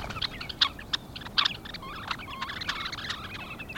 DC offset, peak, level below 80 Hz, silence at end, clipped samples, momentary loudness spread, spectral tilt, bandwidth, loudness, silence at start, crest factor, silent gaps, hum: under 0.1%; -8 dBFS; -50 dBFS; 0 s; under 0.1%; 12 LU; -2.5 dB/octave; over 20 kHz; -31 LUFS; 0 s; 24 dB; none; none